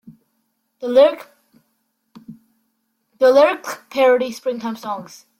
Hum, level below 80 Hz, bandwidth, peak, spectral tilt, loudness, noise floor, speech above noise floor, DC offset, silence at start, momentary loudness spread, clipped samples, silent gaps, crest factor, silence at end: none; -68 dBFS; 16 kHz; -2 dBFS; -4 dB/octave; -17 LUFS; -70 dBFS; 53 dB; under 0.1%; 0.8 s; 16 LU; under 0.1%; none; 18 dB; 0.35 s